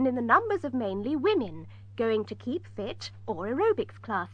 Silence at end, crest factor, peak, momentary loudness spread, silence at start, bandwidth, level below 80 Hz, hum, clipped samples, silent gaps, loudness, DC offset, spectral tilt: 0 s; 20 dB; -10 dBFS; 14 LU; 0 s; 8.6 kHz; -62 dBFS; none; under 0.1%; none; -29 LUFS; under 0.1%; -6.5 dB/octave